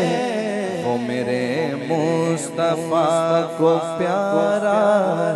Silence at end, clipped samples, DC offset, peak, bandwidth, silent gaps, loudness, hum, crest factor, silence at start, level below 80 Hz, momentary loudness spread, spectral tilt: 0 s; under 0.1%; under 0.1%; -4 dBFS; 12 kHz; none; -20 LUFS; none; 16 dB; 0 s; -66 dBFS; 5 LU; -5.5 dB/octave